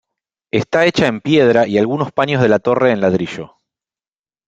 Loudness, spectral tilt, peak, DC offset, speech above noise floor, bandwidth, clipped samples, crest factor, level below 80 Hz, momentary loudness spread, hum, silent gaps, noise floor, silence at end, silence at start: -15 LUFS; -6.5 dB/octave; 0 dBFS; under 0.1%; over 76 dB; 8.6 kHz; under 0.1%; 16 dB; -54 dBFS; 8 LU; none; none; under -90 dBFS; 1 s; 0.55 s